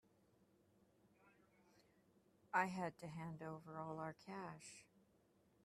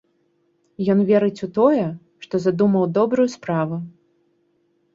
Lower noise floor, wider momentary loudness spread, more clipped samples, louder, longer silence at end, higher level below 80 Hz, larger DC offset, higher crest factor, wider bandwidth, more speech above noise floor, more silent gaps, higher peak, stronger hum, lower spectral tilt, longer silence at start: first, -77 dBFS vs -65 dBFS; first, 15 LU vs 11 LU; neither; second, -47 LUFS vs -20 LUFS; second, 0.8 s vs 1.05 s; second, -84 dBFS vs -64 dBFS; neither; first, 28 dB vs 18 dB; first, 14 kHz vs 7.6 kHz; second, 29 dB vs 46 dB; neither; second, -24 dBFS vs -4 dBFS; neither; second, -5.5 dB/octave vs -8 dB/octave; first, 1.25 s vs 0.8 s